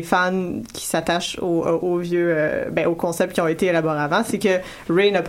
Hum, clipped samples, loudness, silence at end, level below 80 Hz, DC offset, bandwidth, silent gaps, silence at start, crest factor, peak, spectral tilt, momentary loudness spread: none; under 0.1%; -21 LUFS; 0 s; -52 dBFS; under 0.1%; 16.5 kHz; none; 0 s; 16 dB; -4 dBFS; -5 dB/octave; 4 LU